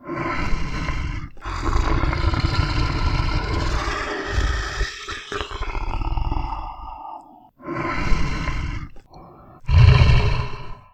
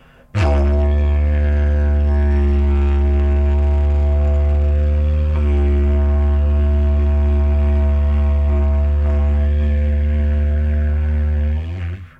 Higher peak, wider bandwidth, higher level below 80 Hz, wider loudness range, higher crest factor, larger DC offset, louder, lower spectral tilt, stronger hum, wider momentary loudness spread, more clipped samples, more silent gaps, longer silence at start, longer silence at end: about the same, -2 dBFS vs -4 dBFS; first, 9.2 kHz vs 3.5 kHz; second, -24 dBFS vs -16 dBFS; first, 9 LU vs 1 LU; first, 20 dB vs 12 dB; neither; second, -23 LUFS vs -17 LUFS; second, -6 dB/octave vs -9.5 dB/octave; neither; first, 17 LU vs 2 LU; neither; neither; second, 0 s vs 0.35 s; about the same, 0.15 s vs 0.1 s